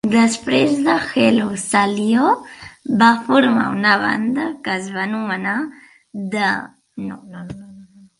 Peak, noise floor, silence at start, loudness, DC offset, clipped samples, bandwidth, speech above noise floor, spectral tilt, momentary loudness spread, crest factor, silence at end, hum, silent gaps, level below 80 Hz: 0 dBFS; -43 dBFS; 0.05 s; -17 LUFS; under 0.1%; under 0.1%; 11.5 kHz; 26 dB; -4.5 dB/octave; 19 LU; 18 dB; 0.35 s; none; none; -58 dBFS